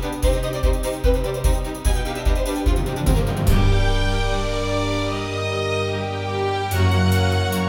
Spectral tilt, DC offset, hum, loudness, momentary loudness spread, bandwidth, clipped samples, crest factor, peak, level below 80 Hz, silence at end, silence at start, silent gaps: -5.5 dB/octave; under 0.1%; none; -21 LUFS; 5 LU; 17 kHz; under 0.1%; 14 dB; -6 dBFS; -24 dBFS; 0 s; 0 s; none